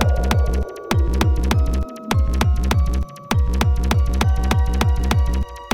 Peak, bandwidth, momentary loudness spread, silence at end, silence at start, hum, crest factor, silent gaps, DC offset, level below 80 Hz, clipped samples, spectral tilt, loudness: -4 dBFS; 17 kHz; 5 LU; 0 s; 0 s; none; 12 dB; none; under 0.1%; -20 dBFS; under 0.1%; -6 dB/octave; -20 LUFS